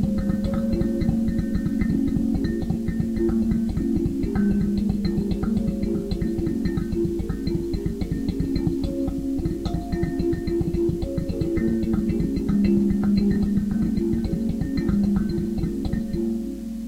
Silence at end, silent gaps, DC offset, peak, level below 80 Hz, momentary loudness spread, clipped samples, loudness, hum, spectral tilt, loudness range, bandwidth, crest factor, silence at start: 0 s; none; under 0.1%; -8 dBFS; -32 dBFS; 5 LU; under 0.1%; -24 LUFS; none; -8.5 dB/octave; 3 LU; 15.5 kHz; 14 dB; 0 s